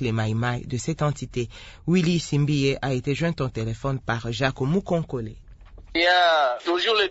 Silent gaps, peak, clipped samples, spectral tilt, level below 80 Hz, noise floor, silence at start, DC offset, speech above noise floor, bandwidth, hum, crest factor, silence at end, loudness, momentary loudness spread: none; -6 dBFS; under 0.1%; -5.5 dB/octave; -46 dBFS; -44 dBFS; 0 s; under 0.1%; 21 dB; 8 kHz; none; 18 dB; 0 s; -24 LUFS; 11 LU